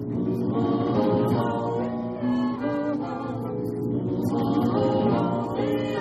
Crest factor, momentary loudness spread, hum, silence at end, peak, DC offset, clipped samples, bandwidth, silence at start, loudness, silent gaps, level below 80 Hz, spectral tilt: 14 dB; 7 LU; none; 0 s; -10 dBFS; under 0.1%; under 0.1%; 13 kHz; 0 s; -25 LUFS; none; -54 dBFS; -8.5 dB/octave